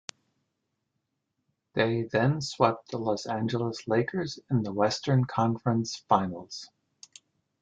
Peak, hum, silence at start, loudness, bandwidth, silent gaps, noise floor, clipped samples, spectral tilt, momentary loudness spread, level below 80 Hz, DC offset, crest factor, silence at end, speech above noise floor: -6 dBFS; none; 1.75 s; -28 LUFS; 9 kHz; none; -81 dBFS; under 0.1%; -6 dB/octave; 9 LU; -66 dBFS; under 0.1%; 22 dB; 0.95 s; 53 dB